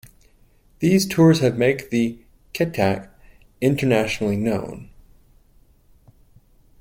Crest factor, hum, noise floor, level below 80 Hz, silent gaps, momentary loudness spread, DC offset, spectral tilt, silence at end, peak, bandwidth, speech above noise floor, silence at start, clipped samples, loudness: 18 dB; none; -55 dBFS; -50 dBFS; none; 13 LU; under 0.1%; -6 dB/octave; 1.95 s; -4 dBFS; 16.5 kHz; 36 dB; 0.8 s; under 0.1%; -20 LUFS